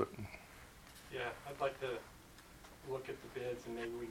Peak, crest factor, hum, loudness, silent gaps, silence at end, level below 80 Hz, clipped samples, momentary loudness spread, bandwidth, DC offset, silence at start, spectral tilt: -20 dBFS; 24 dB; none; -45 LUFS; none; 0 s; -64 dBFS; under 0.1%; 16 LU; 17 kHz; under 0.1%; 0 s; -5 dB/octave